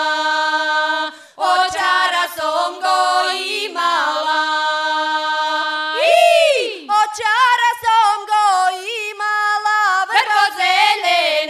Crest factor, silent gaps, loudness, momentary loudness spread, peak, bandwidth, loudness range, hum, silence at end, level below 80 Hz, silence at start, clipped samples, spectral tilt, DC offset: 14 dB; none; -16 LUFS; 6 LU; -2 dBFS; 15 kHz; 3 LU; none; 0 s; -66 dBFS; 0 s; under 0.1%; 0.5 dB/octave; under 0.1%